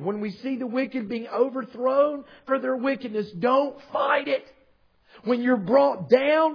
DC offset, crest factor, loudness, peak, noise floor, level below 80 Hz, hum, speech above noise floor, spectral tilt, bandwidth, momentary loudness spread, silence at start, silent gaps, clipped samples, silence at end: under 0.1%; 20 dB; -24 LUFS; -4 dBFS; -61 dBFS; -70 dBFS; none; 37 dB; -7.5 dB/octave; 5.4 kHz; 10 LU; 0 s; none; under 0.1%; 0 s